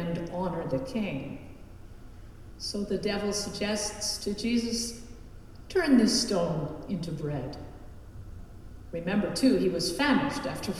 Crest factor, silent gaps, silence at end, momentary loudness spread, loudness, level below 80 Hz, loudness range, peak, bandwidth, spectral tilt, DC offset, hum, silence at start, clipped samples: 18 dB; none; 0 s; 24 LU; -29 LUFS; -48 dBFS; 5 LU; -12 dBFS; 15 kHz; -4.5 dB/octave; under 0.1%; none; 0 s; under 0.1%